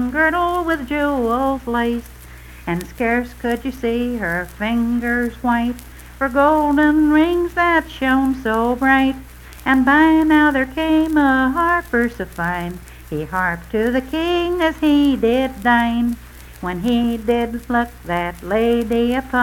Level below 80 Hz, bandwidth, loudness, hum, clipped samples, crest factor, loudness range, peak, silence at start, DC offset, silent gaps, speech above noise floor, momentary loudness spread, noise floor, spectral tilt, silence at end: -38 dBFS; 17.5 kHz; -18 LUFS; none; under 0.1%; 16 dB; 6 LU; -2 dBFS; 0 s; under 0.1%; none; 21 dB; 10 LU; -38 dBFS; -6 dB/octave; 0 s